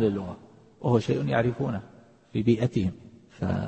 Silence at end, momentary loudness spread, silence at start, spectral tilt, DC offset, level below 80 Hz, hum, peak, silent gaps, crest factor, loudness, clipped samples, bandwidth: 0 s; 13 LU; 0 s; -8 dB/octave; under 0.1%; -54 dBFS; none; -8 dBFS; none; 18 dB; -27 LUFS; under 0.1%; 8.6 kHz